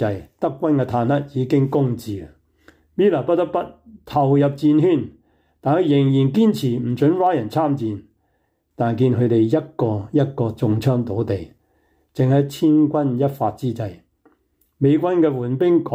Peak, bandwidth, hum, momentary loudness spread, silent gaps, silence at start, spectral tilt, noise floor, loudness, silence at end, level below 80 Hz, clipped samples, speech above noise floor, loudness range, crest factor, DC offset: -6 dBFS; 16 kHz; none; 10 LU; none; 0 s; -9 dB/octave; -67 dBFS; -19 LUFS; 0 s; -56 dBFS; under 0.1%; 49 dB; 3 LU; 12 dB; under 0.1%